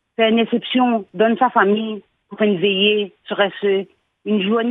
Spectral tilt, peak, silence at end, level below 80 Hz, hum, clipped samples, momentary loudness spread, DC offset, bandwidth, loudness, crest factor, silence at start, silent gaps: -8.5 dB/octave; 0 dBFS; 0 s; -72 dBFS; none; under 0.1%; 10 LU; under 0.1%; 4 kHz; -18 LUFS; 18 dB; 0.2 s; none